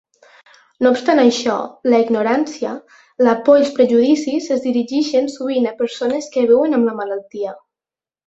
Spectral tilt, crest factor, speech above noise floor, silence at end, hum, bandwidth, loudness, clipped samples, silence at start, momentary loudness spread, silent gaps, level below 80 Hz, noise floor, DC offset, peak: -4.5 dB/octave; 16 dB; over 74 dB; 0.7 s; none; 8 kHz; -16 LUFS; under 0.1%; 0.8 s; 12 LU; none; -64 dBFS; under -90 dBFS; under 0.1%; -2 dBFS